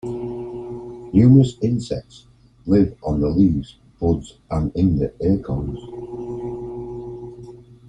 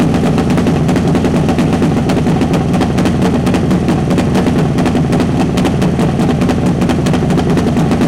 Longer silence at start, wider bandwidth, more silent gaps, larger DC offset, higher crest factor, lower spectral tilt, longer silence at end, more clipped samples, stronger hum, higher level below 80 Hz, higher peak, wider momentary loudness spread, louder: about the same, 0.05 s vs 0 s; second, 9.2 kHz vs 15.5 kHz; neither; second, under 0.1% vs 0.6%; first, 18 dB vs 6 dB; first, -9.5 dB/octave vs -7 dB/octave; first, 0.25 s vs 0 s; neither; neither; second, -38 dBFS vs -28 dBFS; about the same, -2 dBFS vs -4 dBFS; first, 18 LU vs 1 LU; second, -20 LUFS vs -12 LUFS